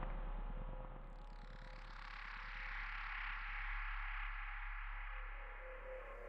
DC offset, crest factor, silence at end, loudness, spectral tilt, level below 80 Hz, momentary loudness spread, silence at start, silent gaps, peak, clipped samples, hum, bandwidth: under 0.1%; 16 dB; 0 s; -49 LUFS; -5.5 dB/octave; -48 dBFS; 11 LU; 0 s; none; -30 dBFS; under 0.1%; none; 5.8 kHz